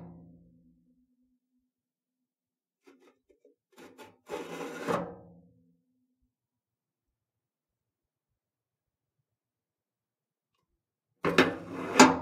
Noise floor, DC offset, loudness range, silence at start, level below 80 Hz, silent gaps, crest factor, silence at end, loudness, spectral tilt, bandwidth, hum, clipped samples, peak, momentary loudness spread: under -90 dBFS; under 0.1%; 14 LU; 0 s; -70 dBFS; none; 34 dB; 0 s; -28 LUFS; -3.5 dB/octave; 16 kHz; none; under 0.1%; 0 dBFS; 22 LU